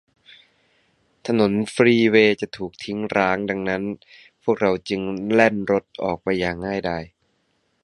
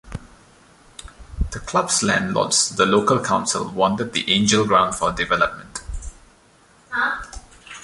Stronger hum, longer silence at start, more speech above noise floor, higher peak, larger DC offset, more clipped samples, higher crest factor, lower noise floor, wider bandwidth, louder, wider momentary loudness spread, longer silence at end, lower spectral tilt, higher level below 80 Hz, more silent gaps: neither; first, 1.25 s vs 0.05 s; first, 47 dB vs 34 dB; about the same, 0 dBFS vs -2 dBFS; neither; neither; about the same, 22 dB vs 20 dB; first, -68 dBFS vs -53 dBFS; about the same, 11.5 kHz vs 11.5 kHz; about the same, -21 LUFS vs -19 LUFS; second, 13 LU vs 23 LU; first, 0.8 s vs 0 s; first, -6 dB/octave vs -3 dB/octave; second, -54 dBFS vs -38 dBFS; neither